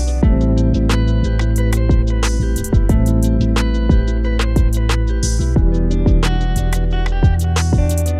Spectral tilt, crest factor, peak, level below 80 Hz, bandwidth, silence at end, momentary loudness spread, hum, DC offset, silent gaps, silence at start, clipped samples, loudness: -6.5 dB/octave; 14 dB; 0 dBFS; -16 dBFS; 14 kHz; 0 s; 3 LU; none; under 0.1%; none; 0 s; under 0.1%; -16 LUFS